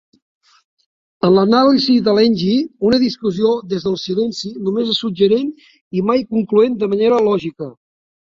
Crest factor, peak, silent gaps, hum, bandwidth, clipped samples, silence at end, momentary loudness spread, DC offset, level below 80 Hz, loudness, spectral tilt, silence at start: 16 dB; -2 dBFS; 5.81-5.91 s; none; 7.6 kHz; under 0.1%; 0.65 s; 9 LU; under 0.1%; -56 dBFS; -16 LUFS; -6.5 dB/octave; 1.25 s